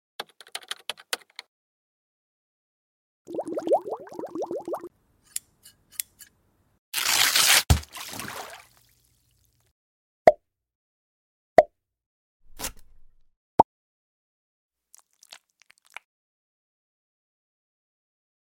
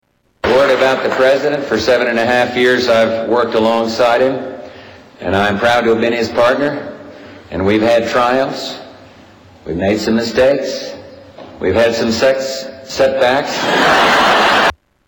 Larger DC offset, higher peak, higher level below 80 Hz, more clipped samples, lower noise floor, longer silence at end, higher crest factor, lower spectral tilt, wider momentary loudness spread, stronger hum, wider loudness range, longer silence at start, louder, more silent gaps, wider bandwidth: neither; about the same, -2 dBFS vs -4 dBFS; about the same, -44 dBFS vs -44 dBFS; neither; first, -67 dBFS vs -41 dBFS; first, 3.2 s vs 0.35 s; first, 28 dB vs 10 dB; second, -2.5 dB/octave vs -4.5 dB/octave; first, 23 LU vs 15 LU; neither; first, 10 LU vs 4 LU; second, 0.2 s vs 0.45 s; second, -25 LUFS vs -13 LUFS; first, 1.48-3.25 s, 6.78-6.92 s, 9.71-10.25 s, 10.75-11.56 s, 12.06-12.40 s, 13.36-13.58 s, 13.64-14.70 s vs none; about the same, 17 kHz vs 18 kHz